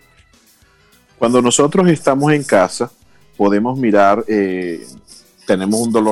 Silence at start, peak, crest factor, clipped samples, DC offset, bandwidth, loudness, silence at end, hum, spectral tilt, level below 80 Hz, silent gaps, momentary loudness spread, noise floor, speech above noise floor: 1.2 s; -2 dBFS; 14 dB; under 0.1%; under 0.1%; 13 kHz; -15 LUFS; 0 s; none; -5 dB/octave; -54 dBFS; none; 12 LU; -52 dBFS; 38 dB